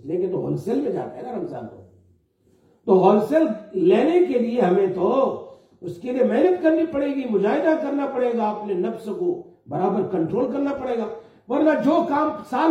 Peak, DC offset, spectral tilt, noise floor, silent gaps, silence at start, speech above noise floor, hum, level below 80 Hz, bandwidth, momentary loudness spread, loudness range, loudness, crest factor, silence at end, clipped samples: -4 dBFS; under 0.1%; -8 dB/octave; -61 dBFS; none; 0.05 s; 40 dB; none; -64 dBFS; 10 kHz; 14 LU; 5 LU; -21 LUFS; 18 dB; 0 s; under 0.1%